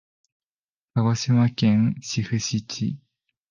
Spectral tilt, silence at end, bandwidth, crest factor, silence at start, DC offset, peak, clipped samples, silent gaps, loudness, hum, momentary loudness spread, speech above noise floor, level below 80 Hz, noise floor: -5.5 dB/octave; 0.55 s; 7.4 kHz; 16 dB; 0.95 s; under 0.1%; -8 dBFS; under 0.1%; none; -23 LUFS; none; 10 LU; over 68 dB; -56 dBFS; under -90 dBFS